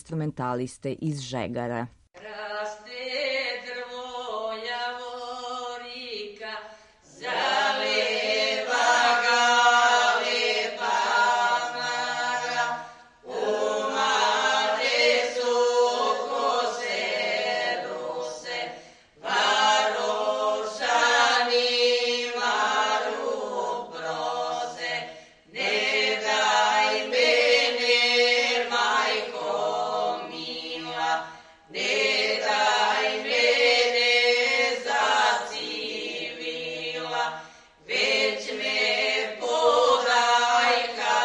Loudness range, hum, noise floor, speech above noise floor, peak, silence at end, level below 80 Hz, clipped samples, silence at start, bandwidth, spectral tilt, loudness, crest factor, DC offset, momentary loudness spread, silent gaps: 10 LU; none; -51 dBFS; 21 dB; -8 dBFS; 0 s; -68 dBFS; under 0.1%; 0.1 s; 11 kHz; -2 dB/octave; -24 LUFS; 16 dB; under 0.1%; 14 LU; none